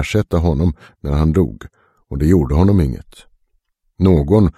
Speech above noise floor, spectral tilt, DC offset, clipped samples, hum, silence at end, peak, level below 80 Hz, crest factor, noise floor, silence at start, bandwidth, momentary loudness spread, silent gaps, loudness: 49 dB; -8.5 dB/octave; under 0.1%; under 0.1%; none; 0.05 s; 0 dBFS; -26 dBFS; 16 dB; -64 dBFS; 0 s; 13 kHz; 14 LU; none; -16 LUFS